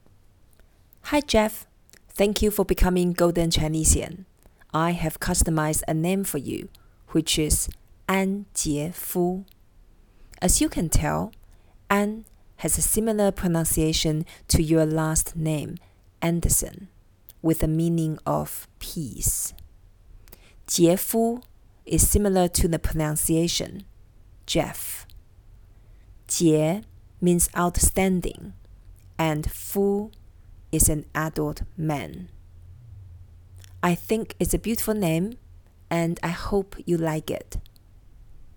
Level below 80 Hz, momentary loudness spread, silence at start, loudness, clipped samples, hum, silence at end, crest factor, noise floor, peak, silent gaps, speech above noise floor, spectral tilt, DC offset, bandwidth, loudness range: -34 dBFS; 14 LU; 1.05 s; -24 LUFS; under 0.1%; none; 0.05 s; 22 dB; -55 dBFS; -4 dBFS; none; 31 dB; -4.5 dB/octave; under 0.1%; 19 kHz; 5 LU